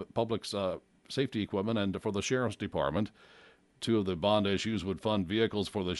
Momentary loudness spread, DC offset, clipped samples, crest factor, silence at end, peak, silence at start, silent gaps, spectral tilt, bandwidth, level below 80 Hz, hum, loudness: 7 LU; under 0.1%; under 0.1%; 20 dB; 0 s; -14 dBFS; 0 s; none; -5.5 dB/octave; 11.5 kHz; -60 dBFS; none; -32 LUFS